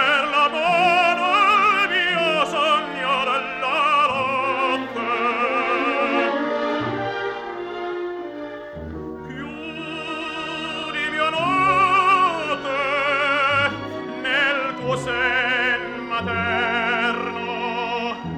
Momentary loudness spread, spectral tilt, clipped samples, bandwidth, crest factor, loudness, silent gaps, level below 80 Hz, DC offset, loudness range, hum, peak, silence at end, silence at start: 14 LU; -4 dB/octave; under 0.1%; 13.5 kHz; 16 dB; -20 LUFS; none; -52 dBFS; under 0.1%; 10 LU; none; -6 dBFS; 0 s; 0 s